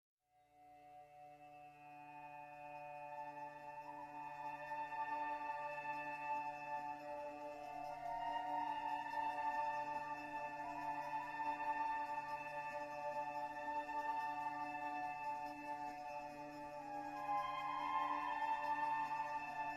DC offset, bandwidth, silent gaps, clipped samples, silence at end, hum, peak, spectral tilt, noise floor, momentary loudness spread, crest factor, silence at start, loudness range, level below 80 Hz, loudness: under 0.1%; 14.5 kHz; none; under 0.1%; 0 s; none; -30 dBFS; -4.5 dB/octave; -71 dBFS; 13 LU; 16 dB; 0.55 s; 9 LU; -76 dBFS; -45 LUFS